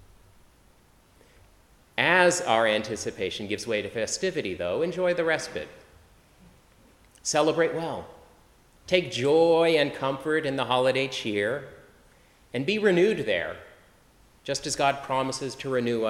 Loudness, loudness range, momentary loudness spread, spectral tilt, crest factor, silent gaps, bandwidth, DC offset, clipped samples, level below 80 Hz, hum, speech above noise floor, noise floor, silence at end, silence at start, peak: -25 LUFS; 5 LU; 13 LU; -4 dB/octave; 22 dB; none; 13.5 kHz; under 0.1%; under 0.1%; -60 dBFS; none; 33 dB; -59 dBFS; 0 s; 1.95 s; -6 dBFS